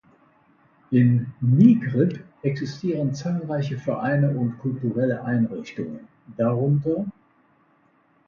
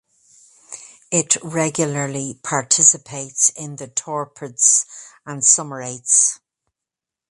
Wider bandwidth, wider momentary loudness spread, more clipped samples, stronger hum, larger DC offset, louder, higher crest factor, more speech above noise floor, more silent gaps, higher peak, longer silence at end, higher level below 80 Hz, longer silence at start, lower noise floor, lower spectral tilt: second, 7 kHz vs 11.5 kHz; second, 14 LU vs 21 LU; neither; neither; neither; second, -23 LUFS vs -16 LUFS; about the same, 18 dB vs 22 dB; second, 40 dB vs 67 dB; neither; second, -4 dBFS vs 0 dBFS; first, 1.15 s vs 0.95 s; about the same, -62 dBFS vs -66 dBFS; first, 0.9 s vs 0.7 s; second, -62 dBFS vs -86 dBFS; first, -9 dB/octave vs -2 dB/octave